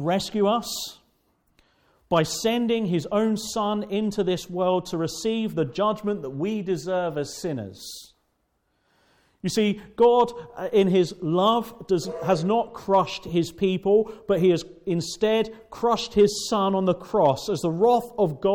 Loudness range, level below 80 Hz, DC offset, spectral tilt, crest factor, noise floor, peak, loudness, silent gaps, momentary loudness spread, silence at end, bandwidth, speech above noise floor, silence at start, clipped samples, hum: 6 LU; -56 dBFS; under 0.1%; -5.5 dB/octave; 16 dB; -72 dBFS; -8 dBFS; -24 LUFS; none; 8 LU; 0 s; 18 kHz; 48 dB; 0 s; under 0.1%; none